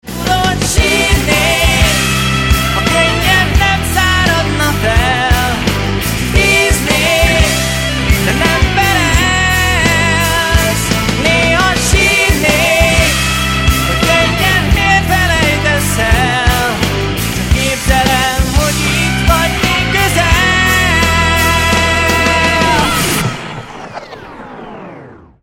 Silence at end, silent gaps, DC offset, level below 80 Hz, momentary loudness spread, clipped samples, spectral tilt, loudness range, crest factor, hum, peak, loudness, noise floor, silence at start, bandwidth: 0.3 s; none; under 0.1%; -20 dBFS; 5 LU; under 0.1%; -3.5 dB/octave; 2 LU; 12 dB; none; 0 dBFS; -11 LUFS; -34 dBFS; 0.05 s; 17.5 kHz